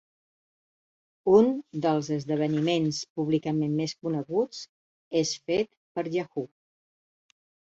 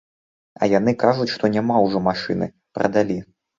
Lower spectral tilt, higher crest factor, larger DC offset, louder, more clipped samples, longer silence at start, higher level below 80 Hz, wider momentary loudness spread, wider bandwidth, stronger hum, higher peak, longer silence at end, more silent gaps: about the same, -6 dB/octave vs -7 dB/octave; about the same, 20 dB vs 20 dB; neither; second, -27 LUFS vs -20 LUFS; neither; first, 1.25 s vs 0.6 s; second, -68 dBFS vs -54 dBFS; first, 13 LU vs 7 LU; about the same, 8 kHz vs 7.6 kHz; neither; second, -8 dBFS vs -2 dBFS; first, 1.25 s vs 0.35 s; first, 3.10-3.16 s, 4.69-5.11 s, 5.77-5.95 s vs none